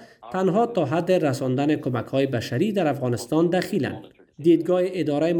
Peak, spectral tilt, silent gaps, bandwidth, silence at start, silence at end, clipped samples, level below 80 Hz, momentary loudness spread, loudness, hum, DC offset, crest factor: -8 dBFS; -7 dB/octave; none; over 20 kHz; 0 s; 0 s; under 0.1%; -64 dBFS; 6 LU; -23 LUFS; none; under 0.1%; 14 dB